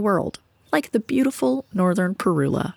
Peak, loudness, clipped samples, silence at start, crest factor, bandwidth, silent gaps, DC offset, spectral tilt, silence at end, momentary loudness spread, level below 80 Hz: -6 dBFS; -22 LUFS; under 0.1%; 0 s; 16 dB; 18 kHz; none; under 0.1%; -6.5 dB/octave; 0.05 s; 4 LU; -56 dBFS